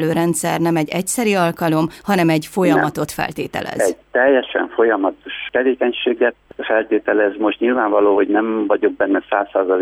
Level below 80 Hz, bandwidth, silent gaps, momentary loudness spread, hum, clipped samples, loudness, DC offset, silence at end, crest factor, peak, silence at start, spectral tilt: -54 dBFS; 17.5 kHz; none; 7 LU; none; under 0.1%; -17 LUFS; under 0.1%; 0 s; 14 dB; -2 dBFS; 0 s; -5 dB/octave